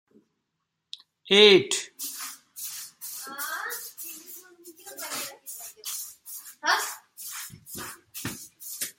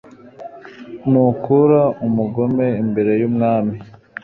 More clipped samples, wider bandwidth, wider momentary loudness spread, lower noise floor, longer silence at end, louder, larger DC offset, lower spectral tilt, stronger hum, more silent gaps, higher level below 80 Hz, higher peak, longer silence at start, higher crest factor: neither; first, 17 kHz vs 4.3 kHz; about the same, 21 LU vs 22 LU; first, -81 dBFS vs -37 dBFS; second, 0.05 s vs 0.35 s; second, -25 LUFS vs -17 LUFS; neither; second, -2 dB/octave vs -11.5 dB/octave; neither; neither; second, -72 dBFS vs -54 dBFS; about the same, -4 dBFS vs -2 dBFS; first, 0.95 s vs 0.25 s; first, 24 dB vs 14 dB